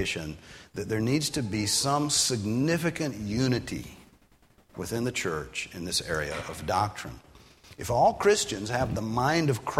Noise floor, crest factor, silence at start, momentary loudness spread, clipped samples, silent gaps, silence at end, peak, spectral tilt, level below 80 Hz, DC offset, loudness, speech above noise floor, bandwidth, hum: -61 dBFS; 20 dB; 0 s; 15 LU; under 0.1%; none; 0 s; -8 dBFS; -4 dB/octave; -52 dBFS; under 0.1%; -27 LUFS; 33 dB; 16 kHz; none